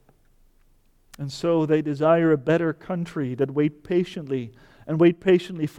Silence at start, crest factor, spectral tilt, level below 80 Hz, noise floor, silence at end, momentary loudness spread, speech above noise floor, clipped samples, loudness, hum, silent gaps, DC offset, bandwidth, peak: 1.2 s; 16 dB; -7.5 dB/octave; -58 dBFS; -59 dBFS; 0.1 s; 11 LU; 37 dB; under 0.1%; -23 LUFS; none; none; under 0.1%; 11 kHz; -8 dBFS